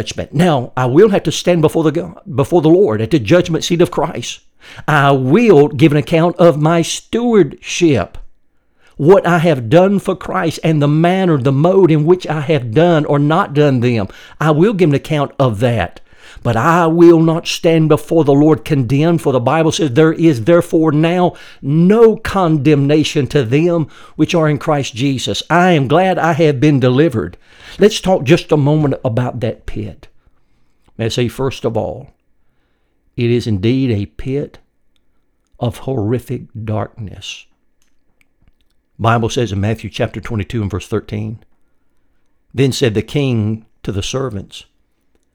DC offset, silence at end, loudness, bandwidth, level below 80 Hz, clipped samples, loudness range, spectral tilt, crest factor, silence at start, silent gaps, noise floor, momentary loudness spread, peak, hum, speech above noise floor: under 0.1%; 0.7 s; -13 LUFS; 16.5 kHz; -42 dBFS; under 0.1%; 9 LU; -6.5 dB/octave; 14 dB; 0 s; none; -59 dBFS; 12 LU; 0 dBFS; none; 46 dB